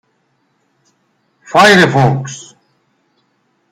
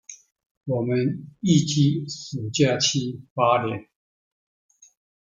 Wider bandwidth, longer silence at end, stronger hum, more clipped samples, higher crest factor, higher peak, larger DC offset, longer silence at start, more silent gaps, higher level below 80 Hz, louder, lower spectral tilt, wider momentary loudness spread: first, 15.5 kHz vs 9.2 kHz; second, 1.3 s vs 1.45 s; neither; neither; about the same, 16 dB vs 20 dB; first, 0 dBFS vs -4 dBFS; neither; first, 1.5 s vs 0.1 s; second, none vs 0.46-0.61 s, 3.31-3.36 s; first, -54 dBFS vs -62 dBFS; first, -9 LUFS vs -23 LUFS; about the same, -5 dB/octave vs -5 dB/octave; first, 20 LU vs 12 LU